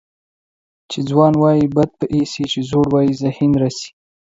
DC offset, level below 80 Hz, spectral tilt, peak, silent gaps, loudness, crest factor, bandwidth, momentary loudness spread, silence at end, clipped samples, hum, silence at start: under 0.1%; -48 dBFS; -7 dB/octave; 0 dBFS; none; -16 LUFS; 16 dB; 7.8 kHz; 11 LU; 0.45 s; under 0.1%; none; 0.9 s